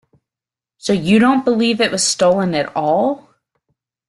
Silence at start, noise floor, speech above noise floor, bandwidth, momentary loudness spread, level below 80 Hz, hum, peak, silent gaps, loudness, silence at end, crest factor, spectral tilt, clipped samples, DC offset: 0.85 s; -89 dBFS; 74 dB; 12.5 kHz; 8 LU; -56 dBFS; none; -2 dBFS; none; -15 LUFS; 0.9 s; 14 dB; -4 dB/octave; under 0.1%; under 0.1%